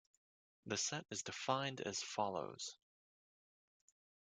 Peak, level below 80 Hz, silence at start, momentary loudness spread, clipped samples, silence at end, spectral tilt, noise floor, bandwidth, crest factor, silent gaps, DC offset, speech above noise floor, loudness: -22 dBFS; -84 dBFS; 0.65 s; 9 LU; under 0.1%; 1.5 s; -2.5 dB/octave; under -90 dBFS; 11 kHz; 24 dB; none; under 0.1%; over 47 dB; -42 LUFS